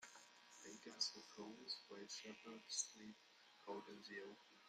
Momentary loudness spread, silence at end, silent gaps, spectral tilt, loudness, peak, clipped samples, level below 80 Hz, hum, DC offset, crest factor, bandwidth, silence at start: 16 LU; 0 s; none; -1 dB/octave; -51 LUFS; -30 dBFS; under 0.1%; under -90 dBFS; none; under 0.1%; 24 dB; 15 kHz; 0 s